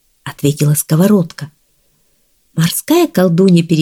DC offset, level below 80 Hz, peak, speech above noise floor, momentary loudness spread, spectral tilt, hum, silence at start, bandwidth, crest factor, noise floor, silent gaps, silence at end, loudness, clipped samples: under 0.1%; -54 dBFS; 0 dBFS; 46 dB; 16 LU; -6 dB/octave; none; 0.25 s; 18.5 kHz; 12 dB; -58 dBFS; none; 0 s; -13 LUFS; under 0.1%